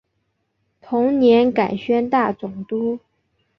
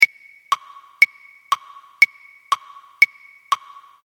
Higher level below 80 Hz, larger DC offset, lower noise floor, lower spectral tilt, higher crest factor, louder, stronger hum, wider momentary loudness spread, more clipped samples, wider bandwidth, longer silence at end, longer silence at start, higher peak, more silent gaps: first, -60 dBFS vs -82 dBFS; neither; first, -71 dBFS vs -31 dBFS; first, -8 dB/octave vs 1.5 dB/octave; second, 16 dB vs 22 dB; about the same, -19 LUFS vs -19 LUFS; neither; first, 12 LU vs 9 LU; neither; second, 6 kHz vs over 20 kHz; about the same, 0.6 s vs 0.5 s; first, 0.85 s vs 0 s; second, -4 dBFS vs 0 dBFS; neither